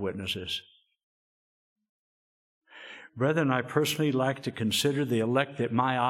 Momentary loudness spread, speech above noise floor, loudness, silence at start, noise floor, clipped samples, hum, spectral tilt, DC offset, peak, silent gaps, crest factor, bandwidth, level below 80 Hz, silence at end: 12 LU; 20 dB; -28 LUFS; 0 s; -48 dBFS; under 0.1%; none; -5 dB/octave; under 0.1%; -8 dBFS; 1.03-1.76 s, 1.89-2.61 s; 22 dB; 16.5 kHz; -70 dBFS; 0 s